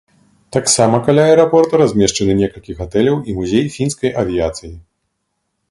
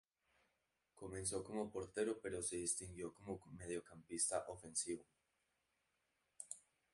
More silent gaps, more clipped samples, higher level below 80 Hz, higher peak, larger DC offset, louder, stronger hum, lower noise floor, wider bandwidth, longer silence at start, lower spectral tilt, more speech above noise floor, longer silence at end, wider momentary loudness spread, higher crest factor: neither; neither; first, -40 dBFS vs -70 dBFS; first, 0 dBFS vs -26 dBFS; neither; first, -14 LUFS vs -45 LUFS; neither; second, -71 dBFS vs -86 dBFS; about the same, 11.5 kHz vs 11.5 kHz; second, 0.55 s vs 0.95 s; first, -5 dB/octave vs -3 dB/octave; first, 57 dB vs 41 dB; first, 0.9 s vs 0.35 s; second, 10 LU vs 13 LU; second, 16 dB vs 22 dB